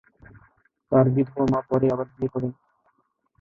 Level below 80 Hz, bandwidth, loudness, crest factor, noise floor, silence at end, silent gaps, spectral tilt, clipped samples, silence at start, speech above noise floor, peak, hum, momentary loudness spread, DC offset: -54 dBFS; 7 kHz; -23 LUFS; 20 dB; -69 dBFS; 0.9 s; none; -10.5 dB/octave; under 0.1%; 0.9 s; 47 dB; -6 dBFS; none; 9 LU; under 0.1%